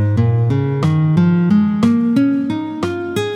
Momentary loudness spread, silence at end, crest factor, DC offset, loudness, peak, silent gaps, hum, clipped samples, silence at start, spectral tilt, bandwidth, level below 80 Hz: 7 LU; 0 s; 12 dB; under 0.1%; -15 LUFS; -2 dBFS; none; none; under 0.1%; 0 s; -8.5 dB/octave; 12 kHz; -48 dBFS